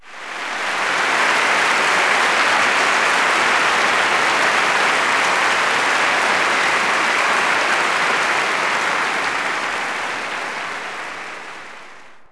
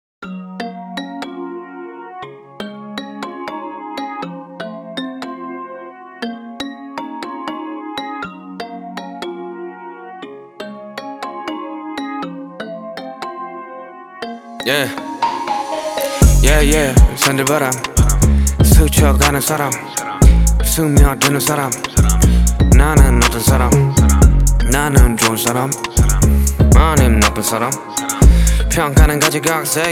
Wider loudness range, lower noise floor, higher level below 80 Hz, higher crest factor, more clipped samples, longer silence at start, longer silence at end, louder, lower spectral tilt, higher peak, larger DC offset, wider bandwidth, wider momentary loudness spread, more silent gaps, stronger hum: second, 6 LU vs 16 LU; first, -42 dBFS vs -34 dBFS; second, -60 dBFS vs -18 dBFS; about the same, 14 dB vs 14 dB; neither; second, 0.05 s vs 0.2 s; about the same, 0.05 s vs 0 s; about the same, -16 LUFS vs -14 LUFS; second, -1 dB/octave vs -4.5 dB/octave; second, -4 dBFS vs 0 dBFS; neither; second, 11 kHz vs 17.5 kHz; second, 11 LU vs 19 LU; neither; neither